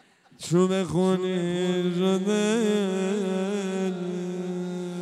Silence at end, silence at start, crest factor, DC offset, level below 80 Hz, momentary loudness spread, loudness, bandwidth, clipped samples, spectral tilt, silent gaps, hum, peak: 0 s; 0.4 s; 16 dB; under 0.1%; -66 dBFS; 8 LU; -26 LUFS; 12.5 kHz; under 0.1%; -6 dB/octave; none; none; -10 dBFS